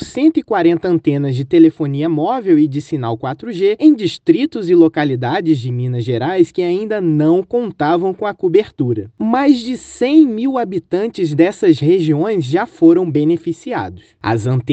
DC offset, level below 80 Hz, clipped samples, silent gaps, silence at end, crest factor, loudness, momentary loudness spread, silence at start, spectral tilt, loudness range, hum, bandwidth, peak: under 0.1%; -56 dBFS; under 0.1%; none; 0 s; 14 dB; -15 LUFS; 9 LU; 0 s; -8 dB/octave; 2 LU; none; 8.4 kHz; 0 dBFS